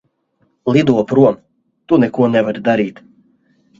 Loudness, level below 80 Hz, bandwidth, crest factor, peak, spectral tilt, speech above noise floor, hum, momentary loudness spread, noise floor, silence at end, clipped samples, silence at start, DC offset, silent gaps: -15 LUFS; -54 dBFS; 7.6 kHz; 16 dB; 0 dBFS; -8 dB/octave; 49 dB; none; 9 LU; -62 dBFS; 0.9 s; under 0.1%; 0.65 s; under 0.1%; none